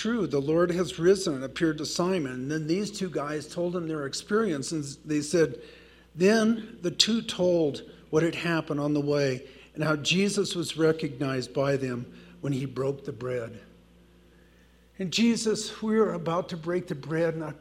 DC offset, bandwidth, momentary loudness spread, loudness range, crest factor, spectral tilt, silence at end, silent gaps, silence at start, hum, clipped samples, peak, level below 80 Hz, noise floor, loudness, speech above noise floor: under 0.1%; 15 kHz; 9 LU; 5 LU; 26 dB; -5 dB/octave; 0 s; none; 0 s; none; under 0.1%; -2 dBFS; -60 dBFS; -58 dBFS; -28 LUFS; 31 dB